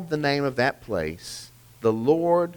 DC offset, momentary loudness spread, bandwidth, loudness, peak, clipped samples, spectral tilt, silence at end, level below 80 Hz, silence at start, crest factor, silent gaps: under 0.1%; 15 LU; over 20 kHz; -24 LUFS; -8 dBFS; under 0.1%; -5.5 dB/octave; 0 s; -54 dBFS; 0 s; 16 dB; none